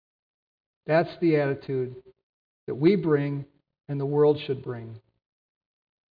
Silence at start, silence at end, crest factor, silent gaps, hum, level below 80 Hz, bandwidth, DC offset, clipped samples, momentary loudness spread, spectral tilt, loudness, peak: 0.85 s; 1.15 s; 18 dB; 2.23-2.67 s; none; -68 dBFS; 5.2 kHz; under 0.1%; under 0.1%; 17 LU; -10.5 dB/octave; -25 LUFS; -10 dBFS